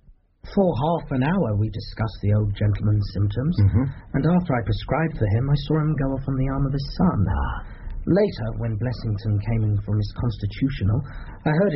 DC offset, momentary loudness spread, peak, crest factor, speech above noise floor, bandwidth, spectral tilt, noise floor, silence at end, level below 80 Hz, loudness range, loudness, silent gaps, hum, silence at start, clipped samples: under 0.1%; 6 LU; -8 dBFS; 14 dB; 22 dB; 5.8 kHz; -8 dB/octave; -44 dBFS; 0 s; -34 dBFS; 2 LU; -23 LUFS; none; none; 0.1 s; under 0.1%